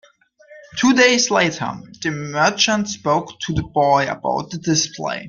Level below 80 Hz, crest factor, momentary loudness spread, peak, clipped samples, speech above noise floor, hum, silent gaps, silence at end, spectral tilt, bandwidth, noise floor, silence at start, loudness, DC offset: -48 dBFS; 18 dB; 12 LU; 0 dBFS; under 0.1%; 31 dB; none; none; 0 s; -3.5 dB/octave; 10 kHz; -50 dBFS; 0.5 s; -18 LUFS; under 0.1%